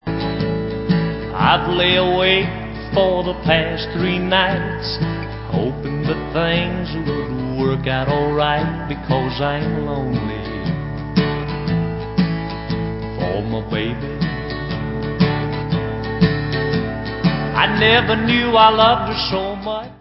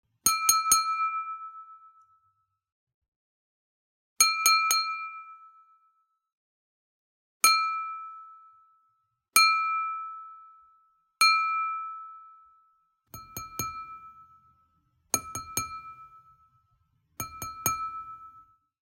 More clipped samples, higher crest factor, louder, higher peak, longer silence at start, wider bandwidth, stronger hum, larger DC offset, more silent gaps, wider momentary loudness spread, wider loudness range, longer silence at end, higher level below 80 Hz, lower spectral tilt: neither; second, 18 dB vs 26 dB; first, -19 LUFS vs -25 LUFS; first, 0 dBFS vs -6 dBFS; second, 0.05 s vs 0.25 s; second, 5.8 kHz vs 16 kHz; neither; neither; second, none vs 2.72-2.87 s, 2.94-3.02 s, 3.08-4.16 s, 6.33-7.40 s; second, 10 LU vs 23 LU; second, 7 LU vs 11 LU; second, 0.05 s vs 0.6 s; first, -34 dBFS vs -68 dBFS; first, -10 dB/octave vs 1 dB/octave